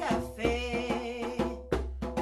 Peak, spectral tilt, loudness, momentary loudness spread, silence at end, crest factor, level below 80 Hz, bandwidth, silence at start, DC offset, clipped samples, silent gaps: -14 dBFS; -5.5 dB/octave; -33 LUFS; 4 LU; 0 s; 18 dB; -42 dBFS; 13.5 kHz; 0 s; under 0.1%; under 0.1%; none